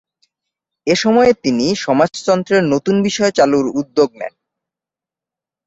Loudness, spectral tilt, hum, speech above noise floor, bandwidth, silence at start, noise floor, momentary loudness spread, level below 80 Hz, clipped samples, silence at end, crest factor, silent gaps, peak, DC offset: -15 LUFS; -5 dB/octave; none; 74 dB; 8 kHz; 0.85 s; -88 dBFS; 6 LU; -54 dBFS; under 0.1%; 1.4 s; 14 dB; none; -2 dBFS; under 0.1%